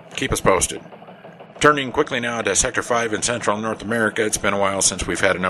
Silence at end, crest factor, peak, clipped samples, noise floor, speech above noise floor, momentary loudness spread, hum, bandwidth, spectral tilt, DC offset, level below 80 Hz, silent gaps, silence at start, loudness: 0 s; 20 dB; 0 dBFS; under 0.1%; -41 dBFS; 21 dB; 6 LU; none; 13.5 kHz; -2.5 dB/octave; under 0.1%; -42 dBFS; none; 0 s; -19 LUFS